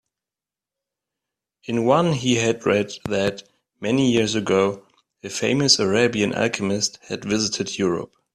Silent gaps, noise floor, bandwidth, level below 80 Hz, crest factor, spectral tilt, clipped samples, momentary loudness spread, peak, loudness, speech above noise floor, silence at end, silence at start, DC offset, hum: none; -89 dBFS; 12.5 kHz; -58 dBFS; 20 dB; -4 dB/octave; under 0.1%; 13 LU; -2 dBFS; -21 LUFS; 69 dB; 0.3 s; 1.7 s; under 0.1%; none